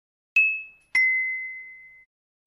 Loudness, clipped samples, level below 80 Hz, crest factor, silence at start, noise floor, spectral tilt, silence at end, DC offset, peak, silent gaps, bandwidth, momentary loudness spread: -22 LUFS; under 0.1%; -76 dBFS; 16 dB; 0.35 s; -44 dBFS; 1.5 dB/octave; 0.6 s; under 0.1%; -12 dBFS; none; 14.5 kHz; 17 LU